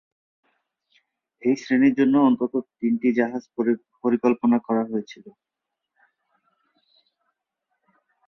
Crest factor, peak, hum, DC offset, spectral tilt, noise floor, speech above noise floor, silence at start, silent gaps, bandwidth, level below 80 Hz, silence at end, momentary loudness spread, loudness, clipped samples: 18 dB; -6 dBFS; none; under 0.1%; -7 dB/octave; -80 dBFS; 59 dB; 1.45 s; none; 6.8 kHz; -70 dBFS; 3 s; 9 LU; -22 LUFS; under 0.1%